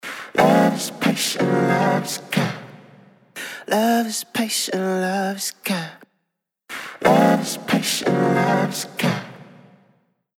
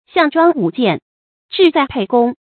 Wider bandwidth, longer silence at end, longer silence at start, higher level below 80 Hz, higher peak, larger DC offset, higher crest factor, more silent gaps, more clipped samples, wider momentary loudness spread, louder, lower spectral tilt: first, 18 kHz vs 4.6 kHz; first, 0.9 s vs 0.2 s; about the same, 0.05 s vs 0.15 s; second, -64 dBFS vs -52 dBFS; about the same, -2 dBFS vs 0 dBFS; neither; about the same, 18 dB vs 16 dB; second, none vs 1.02-1.49 s; neither; first, 16 LU vs 6 LU; second, -20 LUFS vs -14 LUFS; second, -4.5 dB/octave vs -8 dB/octave